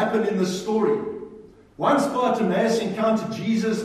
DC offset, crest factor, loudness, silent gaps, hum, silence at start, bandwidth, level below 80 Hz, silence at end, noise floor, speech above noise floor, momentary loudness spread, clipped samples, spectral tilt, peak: under 0.1%; 16 dB; -23 LUFS; none; none; 0 s; 14 kHz; -62 dBFS; 0 s; -46 dBFS; 24 dB; 6 LU; under 0.1%; -5.5 dB/octave; -8 dBFS